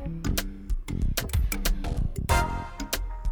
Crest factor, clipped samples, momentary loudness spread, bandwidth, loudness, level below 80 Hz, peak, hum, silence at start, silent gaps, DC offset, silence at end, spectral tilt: 16 dB; under 0.1%; 8 LU; 19.5 kHz; -30 LUFS; -30 dBFS; -12 dBFS; none; 0 s; none; under 0.1%; 0 s; -4.5 dB/octave